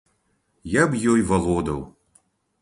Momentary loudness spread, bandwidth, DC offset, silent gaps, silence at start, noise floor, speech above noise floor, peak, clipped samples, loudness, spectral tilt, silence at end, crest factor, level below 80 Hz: 18 LU; 11.5 kHz; under 0.1%; none; 0.65 s; -69 dBFS; 48 dB; -4 dBFS; under 0.1%; -22 LUFS; -6 dB/octave; 0.7 s; 20 dB; -42 dBFS